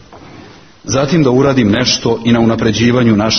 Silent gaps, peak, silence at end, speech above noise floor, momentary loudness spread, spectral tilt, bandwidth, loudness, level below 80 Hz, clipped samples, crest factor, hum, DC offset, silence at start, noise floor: none; 0 dBFS; 0 s; 26 dB; 5 LU; -5 dB/octave; 6.6 kHz; -11 LUFS; -38 dBFS; under 0.1%; 12 dB; none; under 0.1%; 0.1 s; -37 dBFS